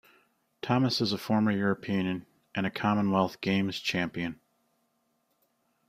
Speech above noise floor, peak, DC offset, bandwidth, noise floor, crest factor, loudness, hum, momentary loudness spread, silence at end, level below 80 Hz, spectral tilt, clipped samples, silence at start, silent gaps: 46 dB; -12 dBFS; under 0.1%; 15 kHz; -75 dBFS; 20 dB; -29 LUFS; none; 10 LU; 1.55 s; -66 dBFS; -6 dB/octave; under 0.1%; 0.65 s; none